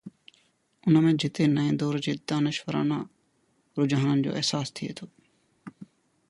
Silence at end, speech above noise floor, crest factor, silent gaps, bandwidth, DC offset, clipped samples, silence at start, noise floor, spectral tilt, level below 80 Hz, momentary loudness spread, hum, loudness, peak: 0.45 s; 44 dB; 18 dB; none; 11.5 kHz; under 0.1%; under 0.1%; 0.05 s; -69 dBFS; -6 dB/octave; -68 dBFS; 15 LU; none; -26 LUFS; -10 dBFS